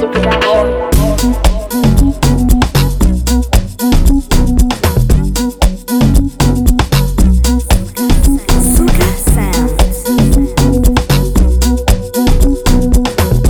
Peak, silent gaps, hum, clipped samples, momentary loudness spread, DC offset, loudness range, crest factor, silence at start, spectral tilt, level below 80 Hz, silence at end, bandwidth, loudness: 0 dBFS; none; none; under 0.1%; 3 LU; under 0.1%; 1 LU; 10 dB; 0 s; -5.5 dB/octave; -12 dBFS; 0 s; over 20 kHz; -12 LUFS